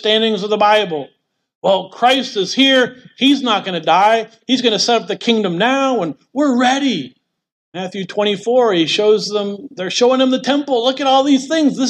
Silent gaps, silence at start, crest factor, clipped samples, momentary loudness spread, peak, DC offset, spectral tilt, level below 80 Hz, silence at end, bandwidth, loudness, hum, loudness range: 1.55-1.62 s, 7.52-7.72 s; 0 s; 14 dB; under 0.1%; 10 LU; -2 dBFS; under 0.1%; -4 dB/octave; -70 dBFS; 0 s; 10.5 kHz; -15 LUFS; none; 3 LU